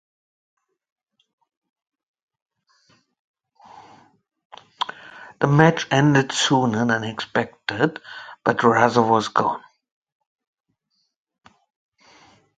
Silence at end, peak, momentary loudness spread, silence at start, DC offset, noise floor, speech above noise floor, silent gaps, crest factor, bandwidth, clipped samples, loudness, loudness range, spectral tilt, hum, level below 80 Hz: 3 s; 0 dBFS; 14 LU; 3.75 s; under 0.1%; -72 dBFS; 53 dB; 4.45-4.50 s; 24 dB; 9.4 kHz; under 0.1%; -20 LUFS; 13 LU; -5 dB/octave; none; -62 dBFS